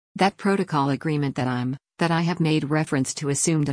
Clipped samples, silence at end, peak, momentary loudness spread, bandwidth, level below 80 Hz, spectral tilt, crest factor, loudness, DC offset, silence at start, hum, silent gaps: under 0.1%; 0 s; -8 dBFS; 4 LU; 10.5 kHz; -60 dBFS; -5 dB/octave; 14 dB; -23 LUFS; under 0.1%; 0.15 s; none; none